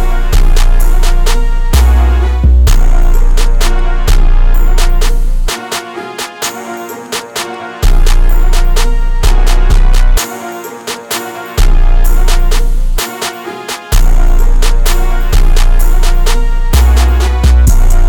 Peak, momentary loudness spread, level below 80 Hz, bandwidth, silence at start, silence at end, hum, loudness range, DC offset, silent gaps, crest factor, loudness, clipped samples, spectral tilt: 0 dBFS; 10 LU; -6 dBFS; 17.5 kHz; 0 s; 0 s; none; 5 LU; under 0.1%; none; 6 dB; -13 LUFS; under 0.1%; -4.5 dB/octave